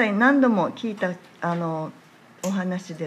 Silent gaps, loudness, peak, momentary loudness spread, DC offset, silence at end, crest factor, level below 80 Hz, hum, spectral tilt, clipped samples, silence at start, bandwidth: none; -24 LUFS; -6 dBFS; 14 LU; under 0.1%; 0 s; 18 dB; -74 dBFS; none; -6.5 dB/octave; under 0.1%; 0 s; 13.5 kHz